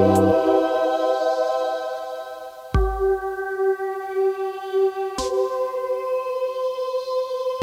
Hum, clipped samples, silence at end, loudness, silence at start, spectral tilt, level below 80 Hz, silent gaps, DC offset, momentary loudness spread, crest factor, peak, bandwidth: none; under 0.1%; 0 s; -23 LUFS; 0 s; -6 dB/octave; -36 dBFS; none; under 0.1%; 9 LU; 18 dB; -4 dBFS; 16 kHz